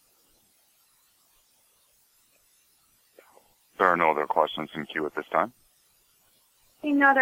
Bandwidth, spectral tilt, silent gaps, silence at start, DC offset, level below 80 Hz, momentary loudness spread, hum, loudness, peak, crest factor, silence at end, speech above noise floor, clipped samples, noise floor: 16.5 kHz; -5.5 dB/octave; none; 3.8 s; under 0.1%; -74 dBFS; 12 LU; none; -25 LUFS; -4 dBFS; 24 dB; 0 s; 41 dB; under 0.1%; -65 dBFS